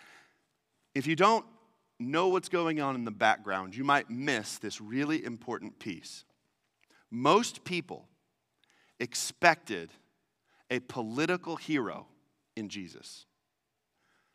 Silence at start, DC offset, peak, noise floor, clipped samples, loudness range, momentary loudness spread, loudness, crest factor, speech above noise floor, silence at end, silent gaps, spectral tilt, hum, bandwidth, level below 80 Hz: 0.95 s; under 0.1%; -6 dBFS; -83 dBFS; under 0.1%; 6 LU; 20 LU; -31 LUFS; 26 dB; 52 dB; 1.15 s; none; -4 dB/octave; none; 15.5 kHz; -80 dBFS